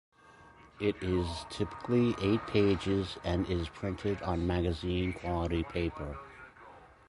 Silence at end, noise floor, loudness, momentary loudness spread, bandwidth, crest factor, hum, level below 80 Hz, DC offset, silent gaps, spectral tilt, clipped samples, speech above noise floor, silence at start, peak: 0.2 s; -57 dBFS; -33 LUFS; 10 LU; 11.5 kHz; 18 dB; none; -46 dBFS; under 0.1%; none; -7 dB/octave; under 0.1%; 25 dB; 0.3 s; -14 dBFS